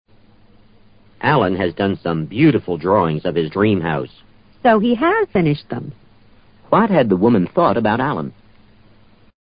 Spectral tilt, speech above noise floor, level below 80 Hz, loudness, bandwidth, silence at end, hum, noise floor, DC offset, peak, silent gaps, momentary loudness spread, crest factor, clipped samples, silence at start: -12 dB/octave; 33 dB; -46 dBFS; -17 LUFS; 5.2 kHz; 1.15 s; none; -49 dBFS; under 0.1%; -2 dBFS; none; 10 LU; 16 dB; under 0.1%; 1.2 s